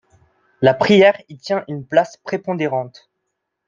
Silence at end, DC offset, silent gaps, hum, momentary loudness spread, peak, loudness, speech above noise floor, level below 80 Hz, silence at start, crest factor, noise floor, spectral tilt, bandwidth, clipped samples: 0.8 s; under 0.1%; none; none; 14 LU; -2 dBFS; -17 LUFS; 59 dB; -62 dBFS; 0.6 s; 18 dB; -76 dBFS; -6 dB/octave; 7.6 kHz; under 0.1%